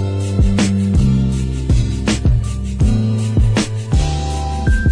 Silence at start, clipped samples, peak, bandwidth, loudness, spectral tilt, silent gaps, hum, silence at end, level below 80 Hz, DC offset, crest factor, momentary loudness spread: 0 s; under 0.1%; -4 dBFS; 10.5 kHz; -17 LUFS; -6.5 dB/octave; none; none; 0 s; -20 dBFS; under 0.1%; 12 dB; 5 LU